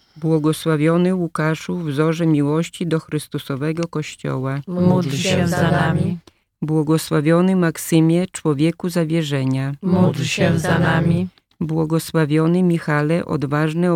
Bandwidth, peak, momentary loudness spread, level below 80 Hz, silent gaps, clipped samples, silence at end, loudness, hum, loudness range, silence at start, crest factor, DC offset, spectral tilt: 16 kHz; -4 dBFS; 8 LU; -56 dBFS; none; under 0.1%; 0 s; -19 LUFS; none; 3 LU; 0.15 s; 14 dB; under 0.1%; -6.5 dB/octave